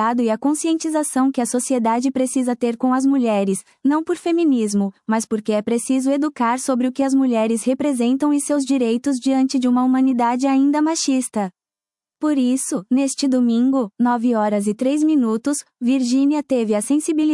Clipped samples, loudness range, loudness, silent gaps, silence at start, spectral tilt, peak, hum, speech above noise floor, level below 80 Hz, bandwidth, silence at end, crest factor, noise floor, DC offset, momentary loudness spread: under 0.1%; 2 LU; -19 LUFS; none; 0 s; -4.5 dB/octave; -6 dBFS; none; over 72 dB; -70 dBFS; 12 kHz; 0 s; 12 dB; under -90 dBFS; under 0.1%; 4 LU